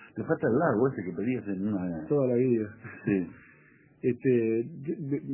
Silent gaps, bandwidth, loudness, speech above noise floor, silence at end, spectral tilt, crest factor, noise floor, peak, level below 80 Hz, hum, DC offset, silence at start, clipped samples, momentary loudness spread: none; 3.1 kHz; -29 LUFS; 31 dB; 0 s; -9.5 dB/octave; 16 dB; -59 dBFS; -12 dBFS; -62 dBFS; none; under 0.1%; 0 s; under 0.1%; 9 LU